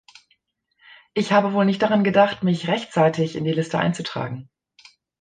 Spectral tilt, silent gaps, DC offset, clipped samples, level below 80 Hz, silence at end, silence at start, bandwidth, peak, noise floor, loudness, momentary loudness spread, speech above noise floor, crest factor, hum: -6.5 dB/octave; none; under 0.1%; under 0.1%; -64 dBFS; 0.8 s; 1.15 s; 9.4 kHz; -4 dBFS; -68 dBFS; -21 LUFS; 11 LU; 48 dB; 18 dB; none